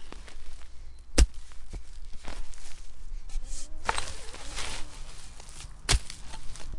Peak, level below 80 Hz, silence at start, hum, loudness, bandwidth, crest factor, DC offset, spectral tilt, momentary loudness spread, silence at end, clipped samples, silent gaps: -8 dBFS; -34 dBFS; 0 s; none; -33 LUFS; 11.5 kHz; 22 dB; under 0.1%; -3 dB/octave; 21 LU; 0 s; under 0.1%; none